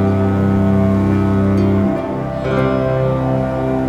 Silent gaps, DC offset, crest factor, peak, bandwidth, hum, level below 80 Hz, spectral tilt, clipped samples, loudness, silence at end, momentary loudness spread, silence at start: none; under 0.1%; 10 dB; -4 dBFS; 7.8 kHz; none; -34 dBFS; -9.5 dB/octave; under 0.1%; -16 LUFS; 0 s; 4 LU; 0 s